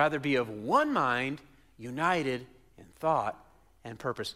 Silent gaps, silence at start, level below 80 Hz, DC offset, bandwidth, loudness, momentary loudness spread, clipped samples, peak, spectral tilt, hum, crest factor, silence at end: none; 0 s; -66 dBFS; under 0.1%; 15.5 kHz; -30 LUFS; 16 LU; under 0.1%; -12 dBFS; -5.5 dB/octave; none; 18 dB; 0 s